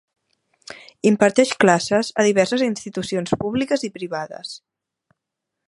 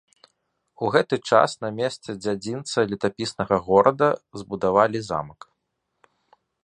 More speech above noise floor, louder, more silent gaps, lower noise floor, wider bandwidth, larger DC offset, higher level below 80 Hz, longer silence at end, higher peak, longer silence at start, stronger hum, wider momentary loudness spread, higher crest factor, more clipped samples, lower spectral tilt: first, 63 dB vs 55 dB; first, -20 LUFS vs -23 LUFS; neither; first, -82 dBFS vs -77 dBFS; about the same, 11.5 kHz vs 10.5 kHz; neither; about the same, -58 dBFS vs -58 dBFS; second, 1.1 s vs 1.35 s; about the same, 0 dBFS vs -2 dBFS; about the same, 0.7 s vs 0.8 s; neither; first, 19 LU vs 11 LU; about the same, 20 dB vs 22 dB; neither; about the same, -4.5 dB/octave vs -5 dB/octave